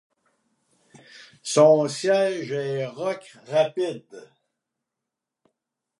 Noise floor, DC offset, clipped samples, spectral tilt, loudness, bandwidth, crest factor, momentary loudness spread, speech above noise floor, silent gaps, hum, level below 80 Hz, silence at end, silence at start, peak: -86 dBFS; under 0.1%; under 0.1%; -4.5 dB/octave; -22 LUFS; 11.5 kHz; 20 dB; 14 LU; 63 dB; none; none; -80 dBFS; 1.8 s; 1.15 s; -4 dBFS